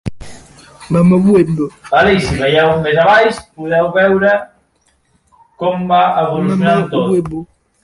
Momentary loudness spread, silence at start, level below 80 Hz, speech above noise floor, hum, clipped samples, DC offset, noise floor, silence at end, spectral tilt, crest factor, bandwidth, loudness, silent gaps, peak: 9 LU; 0.05 s; -40 dBFS; 46 dB; none; under 0.1%; under 0.1%; -58 dBFS; 0.4 s; -6.5 dB/octave; 12 dB; 11.5 kHz; -12 LUFS; none; 0 dBFS